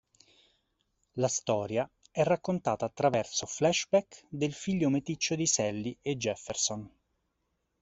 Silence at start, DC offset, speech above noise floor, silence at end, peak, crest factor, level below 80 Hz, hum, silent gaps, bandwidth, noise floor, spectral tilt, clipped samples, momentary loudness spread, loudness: 1.15 s; under 0.1%; 49 dB; 0.95 s; -12 dBFS; 20 dB; -66 dBFS; none; none; 8.2 kHz; -80 dBFS; -4 dB/octave; under 0.1%; 7 LU; -30 LUFS